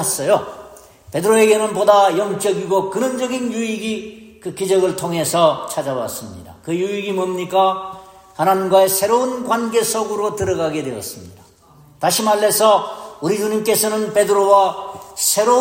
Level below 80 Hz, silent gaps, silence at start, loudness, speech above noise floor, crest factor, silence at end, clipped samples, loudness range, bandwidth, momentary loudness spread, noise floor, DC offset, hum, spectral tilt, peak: -56 dBFS; none; 0 s; -17 LUFS; 31 dB; 18 dB; 0 s; under 0.1%; 4 LU; 16.5 kHz; 16 LU; -48 dBFS; under 0.1%; none; -3.5 dB/octave; 0 dBFS